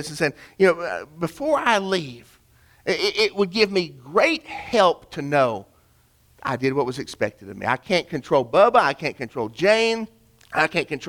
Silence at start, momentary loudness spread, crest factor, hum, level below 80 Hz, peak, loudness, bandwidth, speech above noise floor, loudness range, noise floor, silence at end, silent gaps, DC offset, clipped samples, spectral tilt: 0 s; 11 LU; 20 dB; none; -58 dBFS; -4 dBFS; -22 LUFS; 17.5 kHz; 37 dB; 3 LU; -59 dBFS; 0 s; none; under 0.1%; under 0.1%; -4.5 dB/octave